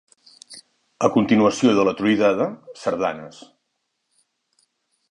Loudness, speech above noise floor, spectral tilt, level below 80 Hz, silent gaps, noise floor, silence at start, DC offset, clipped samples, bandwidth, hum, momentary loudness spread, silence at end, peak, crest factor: -20 LUFS; 56 dB; -5.5 dB/octave; -62 dBFS; none; -75 dBFS; 0.5 s; under 0.1%; under 0.1%; 11 kHz; none; 24 LU; 1.8 s; -2 dBFS; 20 dB